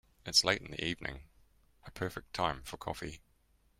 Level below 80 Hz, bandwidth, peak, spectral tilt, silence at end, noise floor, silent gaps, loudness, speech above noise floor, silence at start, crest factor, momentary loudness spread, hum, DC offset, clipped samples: -58 dBFS; 16 kHz; -12 dBFS; -2.5 dB/octave; 0.6 s; -70 dBFS; none; -34 LUFS; 34 dB; 0.25 s; 24 dB; 20 LU; none; under 0.1%; under 0.1%